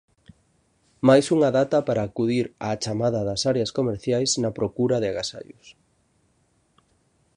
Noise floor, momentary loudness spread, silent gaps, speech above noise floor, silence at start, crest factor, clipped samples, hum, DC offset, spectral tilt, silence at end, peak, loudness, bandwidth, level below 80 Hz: -66 dBFS; 10 LU; none; 43 dB; 1.05 s; 20 dB; under 0.1%; none; under 0.1%; -5 dB/octave; 1.65 s; -4 dBFS; -23 LUFS; 11 kHz; -56 dBFS